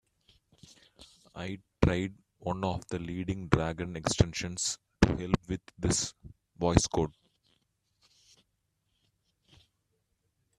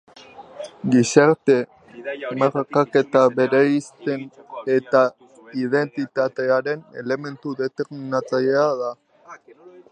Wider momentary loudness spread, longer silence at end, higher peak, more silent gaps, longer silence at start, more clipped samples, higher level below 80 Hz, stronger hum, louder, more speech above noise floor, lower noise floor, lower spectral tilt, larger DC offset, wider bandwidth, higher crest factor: about the same, 12 LU vs 14 LU; first, 3.5 s vs 0.1 s; second, -4 dBFS vs 0 dBFS; neither; first, 1 s vs 0.4 s; neither; first, -46 dBFS vs -70 dBFS; neither; second, -31 LUFS vs -21 LUFS; first, 48 dB vs 27 dB; first, -79 dBFS vs -47 dBFS; about the same, -5 dB/octave vs -5.5 dB/octave; neither; first, 13.5 kHz vs 9.8 kHz; first, 30 dB vs 20 dB